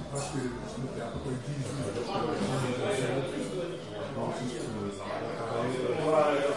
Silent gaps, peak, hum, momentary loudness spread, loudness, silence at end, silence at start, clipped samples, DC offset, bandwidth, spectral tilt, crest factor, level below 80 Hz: none; -14 dBFS; none; 9 LU; -32 LUFS; 0 s; 0 s; under 0.1%; 0.2%; 11.5 kHz; -5.5 dB/octave; 18 dB; -56 dBFS